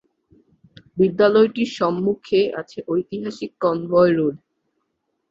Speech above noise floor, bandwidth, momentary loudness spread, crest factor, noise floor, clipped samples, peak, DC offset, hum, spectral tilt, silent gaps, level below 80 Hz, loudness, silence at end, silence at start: 55 dB; 7.6 kHz; 13 LU; 18 dB; -74 dBFS; under 0.1%; -4 dBFS; under 0.1%; none; -7 dB/octave; none; -60 dBFS; -20 LUFS; 0.95 s; 0.95 s